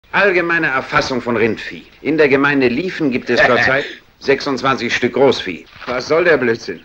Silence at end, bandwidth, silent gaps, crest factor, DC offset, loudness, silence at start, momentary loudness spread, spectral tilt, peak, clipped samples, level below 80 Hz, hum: 0.05 s; 16 kHz; none; 14 dB; under 0.1%; -15 LUFS; 0.15 s; 12 LU; -5 dB/octave; 0 dBFS; under 0.1%; -48 dBFS; none